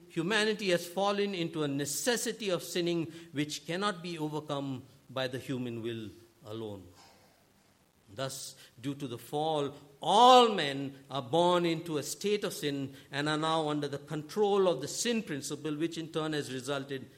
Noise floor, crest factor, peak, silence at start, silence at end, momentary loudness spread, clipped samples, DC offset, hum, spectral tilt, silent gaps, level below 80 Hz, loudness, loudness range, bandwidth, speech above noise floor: -66 dBFS; 26 dB; -6 dBFS; 0 s; 0.1 s; 13 LU; under 0.1%; under 0.1%; none; -4 dB/octave; none; -76 dBFS; -31 LUFS; 14 LU; 16.5 kHz; 35 dB